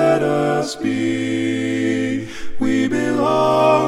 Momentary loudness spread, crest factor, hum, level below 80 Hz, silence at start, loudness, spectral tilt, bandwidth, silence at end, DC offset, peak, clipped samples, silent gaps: 7 LU; 14 dB; none; -44 dBFS; 0 s; -19 LUFS; -6 dB/octave; 13 kHz; 0 s; under 0.1%; -4 dBFS; under 0.1%; none